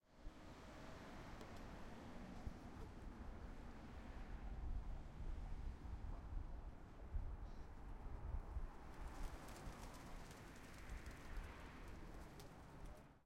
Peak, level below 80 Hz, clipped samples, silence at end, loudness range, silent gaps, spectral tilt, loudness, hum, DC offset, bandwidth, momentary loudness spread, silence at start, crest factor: -34 dBFS; -54 dBFS; under 0.1%; 0 s; 2 LU; none; -6 dB/octave; -56 LUFS; none; under 0.1%; 16 kHz; 7 LU; 0.05 s; 18 dB